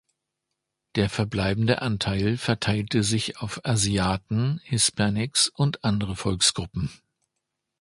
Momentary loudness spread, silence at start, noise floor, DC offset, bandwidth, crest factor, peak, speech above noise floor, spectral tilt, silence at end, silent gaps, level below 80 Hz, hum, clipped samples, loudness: 8 LU; 0.95 s; -82 dBFS; under 0.1%; 11.5 kHz; 20 dB; -6 dBFS; 58 dB; -4 dB/octave; 0.85 s; none; -46 dBFS; none; under 0.1%; -24 LUFS